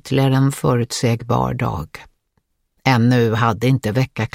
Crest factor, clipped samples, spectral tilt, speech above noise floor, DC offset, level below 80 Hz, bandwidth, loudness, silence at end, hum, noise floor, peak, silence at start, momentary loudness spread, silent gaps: 18 dB; under 0.1%; -6.5 dB/octave; 50 dB; under 0.1%; -44 dBFS; 16 kHz; -18 LUFS; 0.05 s; none; -68 dBFS; 0 dBFS; 0.05 s; 8 LU; none